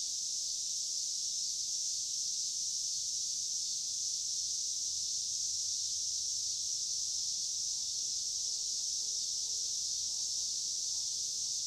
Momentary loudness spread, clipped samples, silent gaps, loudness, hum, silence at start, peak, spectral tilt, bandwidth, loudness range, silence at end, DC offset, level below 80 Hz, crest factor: 1 LU; under 0.1%; none; -33 LUFS; none; 0 s; -22 dBFS; 3 dB/octave; 16 kHz; 0 LU; 0 s; under 0.1%; -74 dBFS; 14 dB